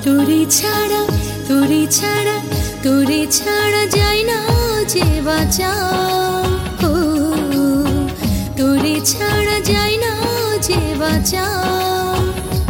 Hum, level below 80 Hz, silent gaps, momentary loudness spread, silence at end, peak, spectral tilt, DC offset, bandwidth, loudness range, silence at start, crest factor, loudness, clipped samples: none; -28 dBFS; none; 5 LU; 0 s; -2 dBFS; -4 dB/octave; under 0.1%; 17 kHz; 2 LU; 0 s; 12 dB; -15 LUFS; under 0.1%